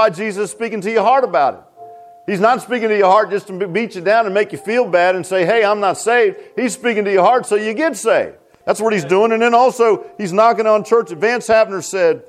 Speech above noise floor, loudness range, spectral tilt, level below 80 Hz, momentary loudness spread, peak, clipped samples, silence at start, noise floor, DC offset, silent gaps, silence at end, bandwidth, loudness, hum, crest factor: 23 dB; 2 LU; -4.5 dB/octave; -62 dBFS; 9 LU; -2 dBFS; under 0.1%; 0 s; -38 dBFS; under 0.1%; none; 0.05 s; 15 kHz; -15 LUFS; none; 14 dB